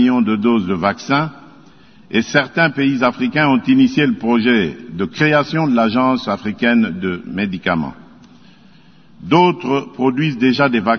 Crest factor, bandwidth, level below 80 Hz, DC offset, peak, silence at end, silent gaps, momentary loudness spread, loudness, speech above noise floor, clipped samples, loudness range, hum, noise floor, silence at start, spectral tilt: 16 dB; 6.6 kHz; -54 dBFS; 0.3%; 0 dBFS; 0 s; none; 9 LU; -16 LUFS; 32 dB; under 0.1%; 4 LU; none; -47 dBFS; 0 s; -6.5 dB/octave